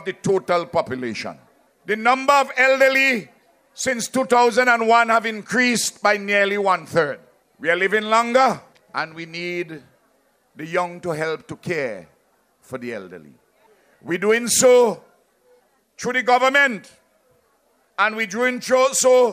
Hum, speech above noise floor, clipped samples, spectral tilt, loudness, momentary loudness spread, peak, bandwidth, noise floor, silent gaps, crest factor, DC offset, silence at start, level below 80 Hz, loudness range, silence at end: none; 43 dB; under 0.1%; -3 dB/octave; -19 LUFS; 16 LU; -2 dBFS; 15.5 kHz; -63 dBFS; none; 20 dB; under 0.1%; 0 s; -66 dBFS; 11 LU; 0 s